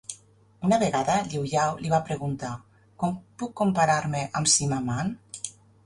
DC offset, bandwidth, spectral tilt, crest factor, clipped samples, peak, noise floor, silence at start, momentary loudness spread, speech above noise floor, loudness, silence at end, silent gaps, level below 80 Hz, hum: under 0.1%; 11.5 kHz; -4 dB/octave; 18 dB; under 0.1%; -8 dBFS; -55 dBFS; 0.1 s; 15 LU; 29 dB; -26 LUFS; 0.35 s; none; -58 dBFS; none